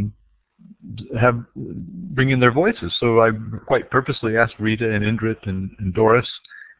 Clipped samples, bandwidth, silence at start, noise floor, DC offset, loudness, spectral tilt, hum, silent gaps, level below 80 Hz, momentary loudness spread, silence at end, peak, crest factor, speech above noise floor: under 0.1%; 4 kHz; 0 s; -57 dBFS; under 0.1%; -19 LUFS; -10.5 dB/octave; none; none; -44 dBFS; 16 LU; 0.15 s; 0 dBFS; 20 dB; 37 dB